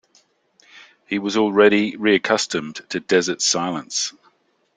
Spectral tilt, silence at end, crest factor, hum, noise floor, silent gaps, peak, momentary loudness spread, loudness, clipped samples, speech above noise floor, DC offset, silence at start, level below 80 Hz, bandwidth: -3 dB/octave; 0.65 s; 20 dB; none; -61 dBFS; none; -2 dBFS; 12 LU; -19 LUFS; under 0.1%; 42 dB; under 0.1%; 0.75 s; -64 dBFS; 9.6 kHz